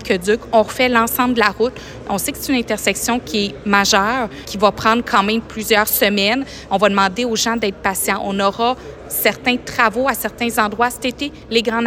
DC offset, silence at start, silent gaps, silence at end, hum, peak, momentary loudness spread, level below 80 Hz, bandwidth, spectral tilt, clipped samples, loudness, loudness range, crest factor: under 0.1%; 0 s; none; 0 s; none; 0 dBFS; 7 LU; -44 dBFS; 16.5 kHz; -3 dB/octave; under 0.1%; -17 LUFS; 2 LU; 16 dB